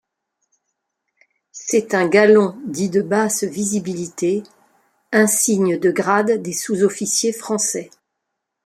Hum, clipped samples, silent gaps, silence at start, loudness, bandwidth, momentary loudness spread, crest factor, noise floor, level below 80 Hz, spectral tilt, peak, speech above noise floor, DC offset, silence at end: none; under 0.1%; none; 1.55 s; -18 LUFS; 16 kHz; 9 LU; 18 dB; -78 dBFS; -64 dBFS; -4 dB/octave; -2 dBFS; 60 dB; under 0.1%; 0.8 s